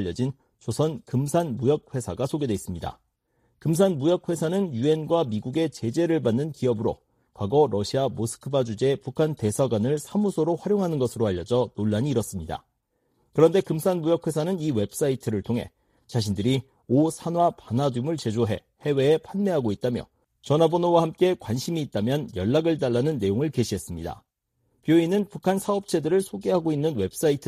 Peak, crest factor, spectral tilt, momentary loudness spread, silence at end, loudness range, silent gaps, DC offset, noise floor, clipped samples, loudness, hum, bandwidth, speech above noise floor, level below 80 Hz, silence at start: -6 dBFS; 18 dB; -6.5 dB/octave; 9 LU; 0 s; 2 LU; none; under 0.1%; -73 dBFS; under 0.1%; -25 LUFS; none; 15.5 kHz; 49 dB; -56 dBFS; 0 s